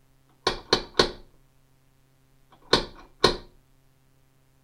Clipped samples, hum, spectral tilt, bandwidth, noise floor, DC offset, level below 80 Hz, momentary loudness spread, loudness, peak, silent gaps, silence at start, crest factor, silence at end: under 0.1%; none; -3 dB/octave; 16 kHz; -62 dBFS; under 0.1%; -46 dBFS; 14 LU; -25 LUFS; -2 dBFS; none; 0.45 s; 28 dB; 1.2 s